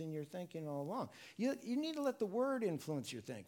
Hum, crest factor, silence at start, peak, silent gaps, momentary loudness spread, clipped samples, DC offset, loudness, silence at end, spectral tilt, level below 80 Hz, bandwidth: none; 14 dB; 0 s; -26 dBFS; none; 9 LU; under 0.1%; under 0.1%; -41 LUFS; 0 s; -6 dB/octave; -86 dBFS; 18 kHz